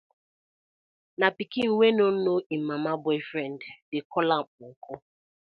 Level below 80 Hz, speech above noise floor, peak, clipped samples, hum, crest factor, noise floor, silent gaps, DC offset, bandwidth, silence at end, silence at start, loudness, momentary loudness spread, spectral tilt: -76 dBFS; over 63 dB; -6 dBFS; under 0.1%; none; 22 dB; under -90 dBFS; 2.46-2.50 s, 3.82-3.92 s, 4.05-4.10 s, 4.47-4.58 s, 4.76-4.82 s; under 0.1%; 5.4 kHz; 0.45 s; 1.2 s; -26 LUFS; 21 LU; -7.5 dB/octave